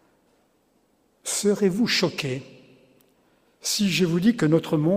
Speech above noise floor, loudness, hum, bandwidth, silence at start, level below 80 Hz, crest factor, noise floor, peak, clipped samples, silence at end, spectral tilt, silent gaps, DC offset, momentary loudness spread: 43 dB; -23 LUFS; none; 16 kHz; 1.25 s; -64 dBFS; 18 dB; -65 dBFS; -6 dBFS; under 0.1%; 0 s; -4.5 dB/octave; none; under 0.1%; 10 LU